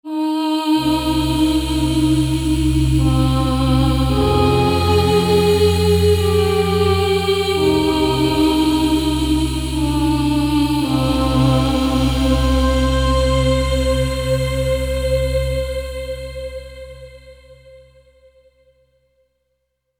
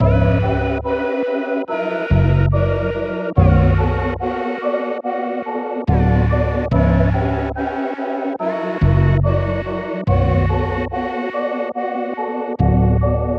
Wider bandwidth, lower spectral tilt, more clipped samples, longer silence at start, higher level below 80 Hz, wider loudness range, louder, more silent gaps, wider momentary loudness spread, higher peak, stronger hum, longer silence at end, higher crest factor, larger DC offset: first, 17 kHz vs 5.6 kHz; second, -6 dB/octave vs -10 dB/octave; neither; about the same, 0.05 s vs 0 s; about the same, -24 dBFS vs -26 dBFS; first, 8 LU vs 2 LU; about the same, -17 LUFS vs -18 LUFS; neither; about the same, 6 LU vs 8 LU; about the same, -2 dBFS vs 0 dBFS; neither; first, 2.25 s vs 0 s; about the same, 16 dB vs 16 dB; neither